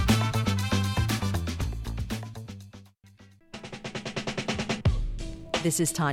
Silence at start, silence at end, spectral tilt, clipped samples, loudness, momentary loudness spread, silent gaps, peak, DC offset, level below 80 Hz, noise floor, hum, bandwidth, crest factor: 0 s; 0 s; -4.5 dB/octave; under 0.1%; -29 LUFS; 17 LU; none; -10 dBFS; under 0.1%; -38 dBFS; -55 dBFS; none; 17 kHz; 18 dB